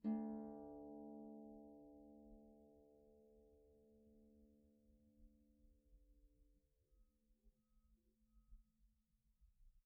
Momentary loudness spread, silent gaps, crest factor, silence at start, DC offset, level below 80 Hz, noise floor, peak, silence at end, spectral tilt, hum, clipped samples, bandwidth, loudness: 19 LU; none; 22 dB; 0 s; under 0.1%; -74 dBFS; -82 dBFS; -34 dBFS; 0.05 s; -8 dB/octave; none; under 0.1%; 2.1 kHz; -54 LUFS